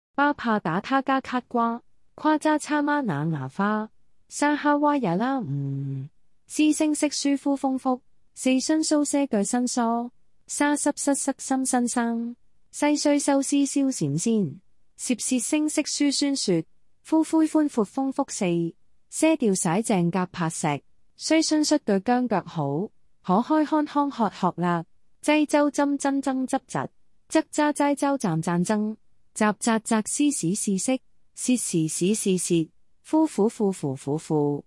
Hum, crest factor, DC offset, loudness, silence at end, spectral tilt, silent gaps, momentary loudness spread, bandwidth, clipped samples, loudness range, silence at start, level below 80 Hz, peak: none; 16 dB; under 0.1%; -24 LUFS; 0.05 s; -4.5 dB/octave; none; 9 LU; 12 kHz; under 0.1%; 2 LU; 0.2 s; -68 dBFS; -8 dBFS